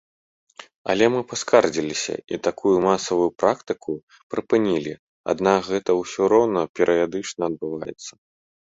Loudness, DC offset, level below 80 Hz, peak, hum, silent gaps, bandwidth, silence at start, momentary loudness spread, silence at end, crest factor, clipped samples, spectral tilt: -22 LUFS; under 0.1%; -58 dBFS; -2 dBFS; none; 0.76-0.85 s, 4.03-4.07 s, 4.23-4.30 s, 4.99-5.24 s, 6.69-6.74 s; 8 kHz; 0.6 s; 14 LU; 0.55 s; 20 dB; under 0.1%; -4.5 dB/octave